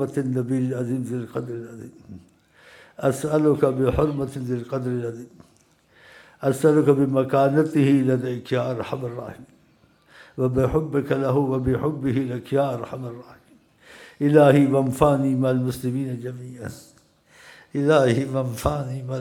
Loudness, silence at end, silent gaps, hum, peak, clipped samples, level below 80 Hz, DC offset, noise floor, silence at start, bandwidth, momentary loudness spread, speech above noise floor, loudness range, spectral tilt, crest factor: -22 LUFS; 0 s; none; none; -2 dBFS; under 0.1%; -46 dBFS; under 0.1%; -59 dBFS; 0 s; 17 kHz; 16 LU; 37 dB; 5 LU; -7.5 dB/octave; 22 dB